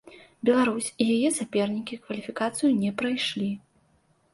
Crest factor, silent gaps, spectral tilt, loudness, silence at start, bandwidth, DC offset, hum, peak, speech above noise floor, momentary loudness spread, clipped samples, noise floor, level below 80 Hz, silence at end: 18 dB; none; -4 dB/octave; -26 LUFS; 0.05 s; 11.5 kHz; under 0.1%; none; -8 dBFS; 40 dB; 11 LU; under 0.1%; -65 dBFS; -68 dBFS; 0.75 s